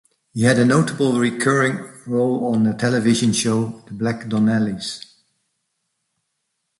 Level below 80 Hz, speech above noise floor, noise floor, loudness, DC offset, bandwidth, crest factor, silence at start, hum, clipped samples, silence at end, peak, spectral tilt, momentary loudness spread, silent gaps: -58 dBFS; 56 dB; -75 dBFS; -19 LUFS; under 0.1%; 11.5 kHz; 18 dB; 0.35 s; none; under 0.1%; 1.8 s; -2 dBFS; -5.5 dB/octave; 12 LU; none